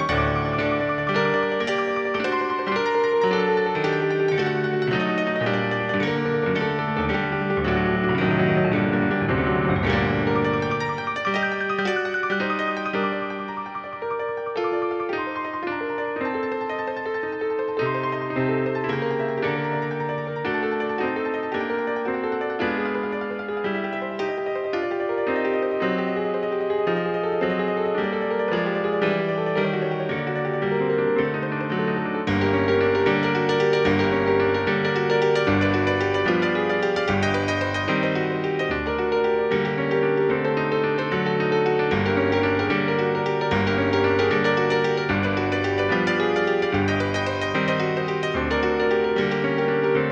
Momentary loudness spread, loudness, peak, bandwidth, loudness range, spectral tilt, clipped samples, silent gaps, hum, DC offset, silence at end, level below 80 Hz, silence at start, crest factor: 6 LU; -23 LUFS; -6 dBFS; 8.2 kHz; 5 LU; -6.5 dB/octave; under 0.1%; none; none; under 0.1%; 0 s; -48 dBFS; 0 s; 16 dB